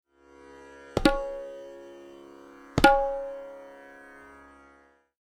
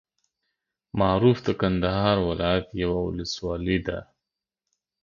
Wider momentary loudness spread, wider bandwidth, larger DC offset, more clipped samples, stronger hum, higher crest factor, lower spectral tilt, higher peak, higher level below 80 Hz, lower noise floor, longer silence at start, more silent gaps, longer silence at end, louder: first, 28 LU vs 9 LU; first, 17 kHz vs 7.4 kHz; neither; neither; neither; about the same, 24 dB vs 20 dB; second, -5 dB/octave vs -6.5 dB/octave; about the same, -6 dBFS vs -6 dBFS; about the same, -42 dBFS vs -42 dBFS; second, -60 dBFS vs -87 dBFS; second, 0.6 s vs 0.95 s; neither; first, 1.3 s vs 1 s; about the same, -26 LUFS vs -25 LUFS